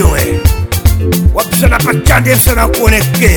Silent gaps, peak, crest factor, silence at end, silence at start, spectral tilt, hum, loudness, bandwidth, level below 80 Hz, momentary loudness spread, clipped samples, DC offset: none; 0 dBFS; 8 dB; 0 s; 0 s; -5 dB/octave; none; -10 LUFS; over 20 kHz; -14 dBFS; 4 LU; 0.7%; under 0.1%